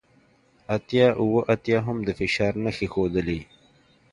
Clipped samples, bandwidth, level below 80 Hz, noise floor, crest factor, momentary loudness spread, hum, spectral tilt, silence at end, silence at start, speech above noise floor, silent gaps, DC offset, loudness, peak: under 0.1%; 10.5 kHz; -48 dBFS; -60 dBFS; 18 dB; 10 LU; none; -7 dB/octave; 0.7 s; 0.7 s; 37 dB; none; under 0.1%; -24 LUFS; -6 dBFS